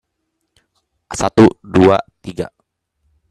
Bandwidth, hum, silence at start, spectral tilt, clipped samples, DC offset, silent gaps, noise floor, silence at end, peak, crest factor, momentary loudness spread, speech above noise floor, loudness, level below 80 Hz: 12 kHz; none; 1.1 s; -6.5 dB/octave; under 0.1%; under 0.1%; none; -72 dBFS; 0.85 s; 0 dBFS; 16 dB; 17 LU; 59 dB; -14 LUFS; -46 dBFS